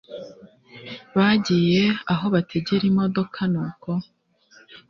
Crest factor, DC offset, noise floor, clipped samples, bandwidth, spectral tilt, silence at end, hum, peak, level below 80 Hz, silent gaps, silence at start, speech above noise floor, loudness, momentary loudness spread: 18 dB; under 0.1%; -55 dBFS; under 0.1%; 7.2 kHz; -7 dB/octave; 0.15 s; none; -6 dBFS; -58 dBFS; none; 0.1 s; 34 dB; -22 LUFS; 20 LU